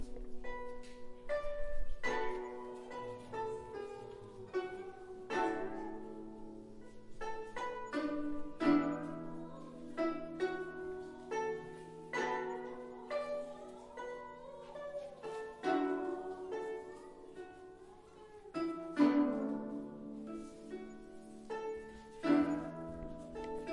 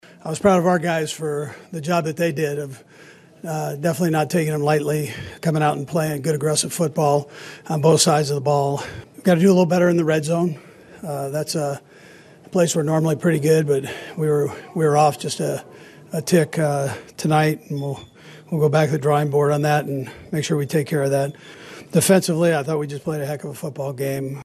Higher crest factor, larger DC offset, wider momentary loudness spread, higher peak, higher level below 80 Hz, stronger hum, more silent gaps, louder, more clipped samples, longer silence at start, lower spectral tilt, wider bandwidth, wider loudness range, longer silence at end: about the same, 22 dB vs 18 dB; neither; first, 18 LU vs 13 LU; second, -18 dBFS vs -2 dBFS; about the same, -54 dBFS vs -58 dBFS; neither; neither; second, -40 LUFS vs -20 LUFS; neither; second, 0 s vs 0.25 s; about the same, -6 dB/octave vs -5.5 dB/octave; second, 11 kHz vs 13 kHz; about the same, 5 LU vs 4 LU; about the same, 0 s vs 0 s